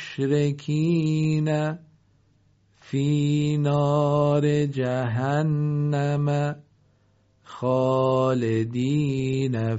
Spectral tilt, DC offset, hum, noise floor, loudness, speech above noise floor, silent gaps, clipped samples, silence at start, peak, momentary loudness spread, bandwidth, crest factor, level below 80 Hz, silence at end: -7.5 dB/octave; under 0.1%; none; -63 dBFS; -24 LUFS; 40 dB; none; under 0.1%; 0 s; -10 dBFS; 5 LU; 8 kHz; 14 dB; -58 dBFS; 0 s